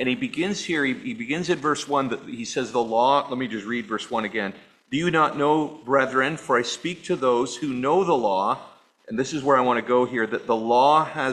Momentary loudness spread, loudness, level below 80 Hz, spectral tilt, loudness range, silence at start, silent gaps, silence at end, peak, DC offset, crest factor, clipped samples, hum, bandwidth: 9 LU; -23 LUFS; -64 dBFS; -4.5 dB/octave; 2 LU; 0 s; none; 0 s; -4 dBFS; under 0.1%; 18 dB; under 0.1%; none; 11.5 kHz